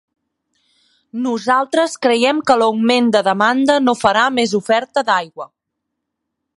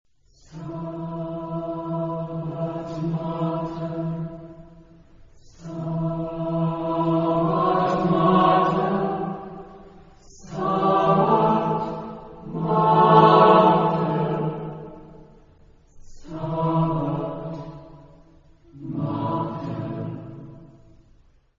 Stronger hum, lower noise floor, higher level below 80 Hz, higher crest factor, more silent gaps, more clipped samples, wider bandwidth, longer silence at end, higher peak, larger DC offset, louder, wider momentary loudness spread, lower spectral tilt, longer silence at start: neither; first, -77 dBFS vs -56 dBFS; second, -62 dBFS vs -52 dBFS; about the same, 16 dB vs 20 dB; neither; neither; first, 11.5 kHz vs 7.2 kHz; first, 1.1 s vs 0.9 s; about the same, 0 dBFS vs -2 dBFS; neither; first, -15 LUFS vs -22 LUFS; second, 9 LU vs 20 LU; second, -4 dB/octave vs -8.5 dB/octave; first, 1.15 s vs 0.5 s